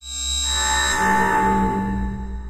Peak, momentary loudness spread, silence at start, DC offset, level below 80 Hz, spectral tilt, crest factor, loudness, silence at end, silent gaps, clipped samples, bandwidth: -6 dBFS; 8 LU; 0 s; under 0.1%; -30 dBFS; -3 dB/octave; 14 dB; -19 LUFS; 0 s; none; under 0.1%; 15.5 kHz